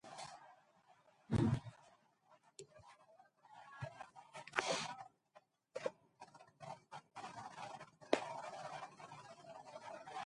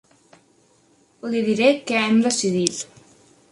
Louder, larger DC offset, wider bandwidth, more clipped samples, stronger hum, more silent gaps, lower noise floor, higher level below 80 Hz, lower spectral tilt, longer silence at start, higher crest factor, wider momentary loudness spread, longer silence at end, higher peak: second, -45 LUFS vs -20 LUFS; neither; about the same, 11.5 kHz vs 11.5 kHz; neither; neither; neither; first, -72 dBFS vs -59 dBFS; about the same, -66 dBFS vs -66 dBFS; about the same, -5 dB/octave vs -4 dB/octave; second, 0.05 s vs 1.25 s; first, 32 dB vs 22 dB; first, 23 LU vs 15 LU; second, 0 s vs 0.7 s; second, -14 dBFS vs 0 dBFS